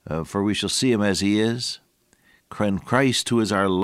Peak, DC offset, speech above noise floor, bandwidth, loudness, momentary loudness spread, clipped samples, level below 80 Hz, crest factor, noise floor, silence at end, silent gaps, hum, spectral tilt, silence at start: -4 dBFS; under 0.1%; 39 dB; 15.5 kHz; -22 LUFS; 8 LU; under 0.1%; -52 dBFS; 18 dB; -61 dBFS; 0 s; none; none; -4.5 dB/octave; 0.05 s